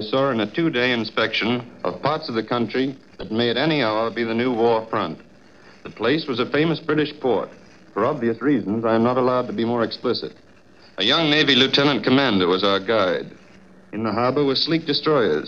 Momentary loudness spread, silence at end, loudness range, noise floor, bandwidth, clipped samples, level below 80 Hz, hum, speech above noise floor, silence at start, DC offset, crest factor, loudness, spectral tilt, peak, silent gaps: 10 LU; 0 s; 4 LU; -51 dBFS; 7.6 kHz; under 0.1%; -60 dBFS; none; 30 dB; 0 s; 0.2%; 18 dB; -20 LUFS; -6 dB/octave; -4 dBFS; none